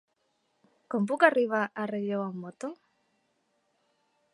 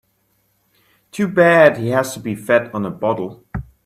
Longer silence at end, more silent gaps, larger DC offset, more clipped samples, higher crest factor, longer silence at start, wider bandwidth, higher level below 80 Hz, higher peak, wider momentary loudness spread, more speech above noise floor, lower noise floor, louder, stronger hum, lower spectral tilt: first, 1.6 s vs 0.25 s; neither; neither; neither; first, 26 dB vs 18 dB; second, 0.9 s vs 1.15 s; second, 11.5 kHz vs 15 kHz; second, -86 dBFS vs -46 dBFS; second, -6 dBFS vs 0 dBFS; about the same, 17 LU vs 18 LU; about the same, 47 dB vs 48 dB; first, -75 dBFS vs -64 dBFS; second, -28 LUFS vs -16 LUFS; neither; about the same, -6.5 dB/octave vs -6 dB/octave